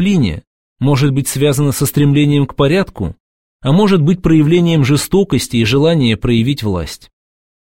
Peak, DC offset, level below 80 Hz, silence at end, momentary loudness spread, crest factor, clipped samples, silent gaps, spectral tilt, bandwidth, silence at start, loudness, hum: 0 dBFS; 0.9%; -36 dBFS; 0.8 s; 10 LU; 12 dB; under 0.1%; 0.47-0.76 s, 3.20-3.59 s; -6 dB/octave; 16.5 kHz; 0 s; -13 LUFS; none